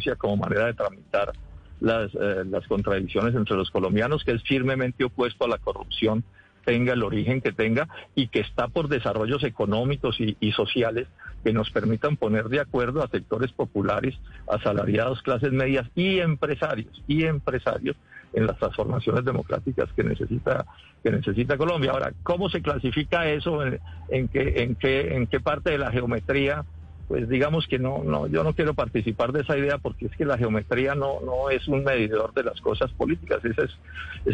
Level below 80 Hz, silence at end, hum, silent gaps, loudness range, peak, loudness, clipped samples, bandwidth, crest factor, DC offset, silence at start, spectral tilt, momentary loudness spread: -44 dBFS; 0 s; none; none; 1 LU; -10 dBFS; -25 LUFS; under 0.1%; 9 kHz; 14 dB; under 0.1%; 0 s; -8 dB/octave; 6 LU